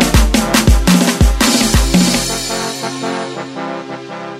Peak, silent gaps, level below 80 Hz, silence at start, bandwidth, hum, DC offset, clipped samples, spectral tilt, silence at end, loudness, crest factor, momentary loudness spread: 0 dBFS; none; -18 dBFS; 0 s; 16 kHz; none; under 0.1%; under 0.1%; -4 dB/octave; 0 s; -13 LUFS; 14 dB; 13 LU